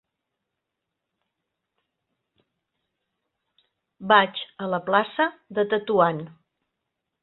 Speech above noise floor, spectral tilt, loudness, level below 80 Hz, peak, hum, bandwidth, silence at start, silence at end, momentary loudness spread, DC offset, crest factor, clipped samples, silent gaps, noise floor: 60 dB; -9 dB/octave; -23 LUFS; -72 dBFS; -2 dBFS; none; 4.3 kHz; 4 s; 0.95 s; 15 LU; under 0.1%; 24 dB; under 0.1%; none; -83 dBFS